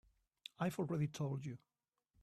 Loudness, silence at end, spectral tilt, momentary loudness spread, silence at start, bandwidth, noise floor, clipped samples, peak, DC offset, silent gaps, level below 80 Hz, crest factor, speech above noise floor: -42 LUFS; 0.65 s; -7 dB/octave; 17 LU; 0.6 s; 14 kHz; -80 dBFS; under 0.1%; -26 dBFS; under 0.1%; none; -76 dBFS; 18 dB; 39 dB